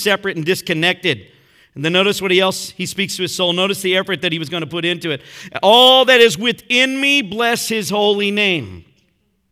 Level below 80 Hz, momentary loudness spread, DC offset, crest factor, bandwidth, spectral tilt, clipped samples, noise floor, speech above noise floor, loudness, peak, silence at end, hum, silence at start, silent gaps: -60 dBFS; 13 LU; under 0.1%; 16 dB; 17.5 kHz; -3 dB/octave; under 0.1%; -63 dBFS; 47 dB; -15 LUFS; 0 dBFS; 0.7 s; none; 0 s; none